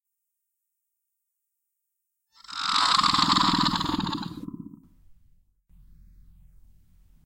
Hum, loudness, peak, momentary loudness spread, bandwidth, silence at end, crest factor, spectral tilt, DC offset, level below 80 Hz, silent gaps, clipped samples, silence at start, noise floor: none; -23 LUFS; -4 dBFS; 20 LU; 16.5 kHz; 2.1 s; 26 dB; -3 dB/octave; under 0.1%; -54 dBFS; none; under 0.1%; 2.5 s; -82 dBFS